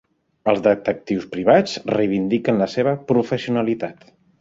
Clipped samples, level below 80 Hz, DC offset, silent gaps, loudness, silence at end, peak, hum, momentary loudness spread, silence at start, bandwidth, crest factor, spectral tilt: under 0.1%; -58 dBFS; under 0.1%; none; -20 LUFS; 0.5 s; -2 dBFS; none; 9 LU; 0.45 s; 7.8 kHz; 18 dB; -6.5 dB/octave